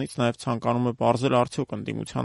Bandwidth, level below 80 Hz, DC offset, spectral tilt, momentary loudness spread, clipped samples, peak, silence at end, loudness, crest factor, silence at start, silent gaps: 11.5 kHz; -58 dBFS; under 0.1%; -6.5 dB/octave; 9 LU; under 0.1%; -6 dBFS; 0 s; -25 LUFS; 20 dB; 0 s; none